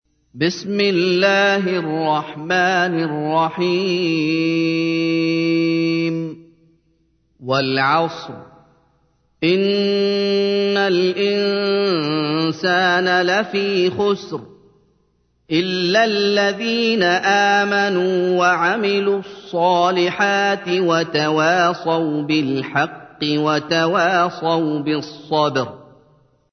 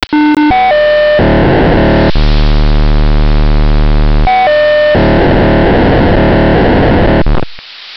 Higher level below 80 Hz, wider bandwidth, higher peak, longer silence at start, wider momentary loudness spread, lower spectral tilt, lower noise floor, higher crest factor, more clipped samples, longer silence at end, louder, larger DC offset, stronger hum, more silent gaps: second, -66 dBFS vs -12 dBFS; about the same, 6.6 kHz vs 6 kHz; about the same, -2 dBFS vs 0 dBFS; first, 0.35 s vs 0 s; about the same, 6 LU vs 4 LU; second, -5 dB/octave vs -8.5 dB/octave; first, -63 dBFS vs -27 dBFS; first, 16 dB vs 6 dB; neither; first, 0.7 s vs 0 s; second, -18 LUFS vs -8 LUFS; neither; neither; neither